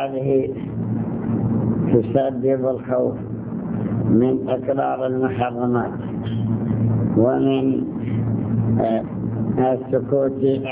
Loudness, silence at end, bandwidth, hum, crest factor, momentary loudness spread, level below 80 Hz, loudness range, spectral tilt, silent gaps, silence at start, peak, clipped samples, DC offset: -21 LUFS; 0 s; 3.8 kHz; none; 18 dB; 7 LU; -46 dBFS; 1 LU; -13 dB/octave; none; 0 s; -2 dBFS; under 0.1%; under 0.1%